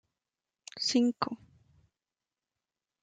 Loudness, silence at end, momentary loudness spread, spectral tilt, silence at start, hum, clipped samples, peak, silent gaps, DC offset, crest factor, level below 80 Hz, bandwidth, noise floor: -30 LUFS; 1.7 s; 21 LU; -3 dB/octave; 0.75 s; none; under 0.1%; -12 dBFS; none; under 0.1%; 24 dB; -76 dBFS; 9.4 kHz; under -90 dBFS